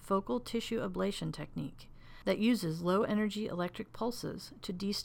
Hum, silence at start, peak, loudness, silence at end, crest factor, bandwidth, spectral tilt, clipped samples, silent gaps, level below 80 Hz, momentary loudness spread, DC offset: none; 0 s; -18 dBFS; -35 LUFS; 0 s; 16 dB; 17.5 kHz; -5.5 dB/octave; under 0.1%; none; -56 dBFS; 12 LU; under 0.1%